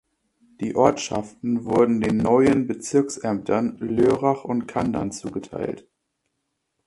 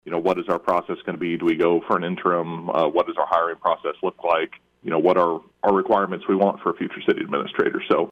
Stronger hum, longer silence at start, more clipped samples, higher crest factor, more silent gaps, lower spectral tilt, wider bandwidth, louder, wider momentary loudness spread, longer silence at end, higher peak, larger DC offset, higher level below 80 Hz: neither; first, 0.6 s vs 0.05 s; neither; first, 22 dB vs 16 dB; neither; second, -6 dB/octave vs -7.5 dB/octave; first, 11.5 kHz vs 7.4 kHz; about the same, -22 LUFS vs -22 LUFS; first, 12 LU vs 7 LU; first, 1.1 s vs 0 s; first, -2 dBFS vs -6 dBFS; neither; first, -52 dBFS vs -62 dBFS